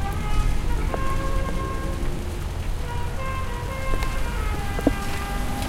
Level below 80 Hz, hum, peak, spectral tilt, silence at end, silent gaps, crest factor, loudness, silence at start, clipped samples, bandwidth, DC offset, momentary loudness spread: -26 dBFS; none; -4 dBFS; -5.5 dB/octave; 0 s; none; 20 dB; -28 LUFS; 0 s; under 0.1%; 16 kHz; under 0.1%; 5 LU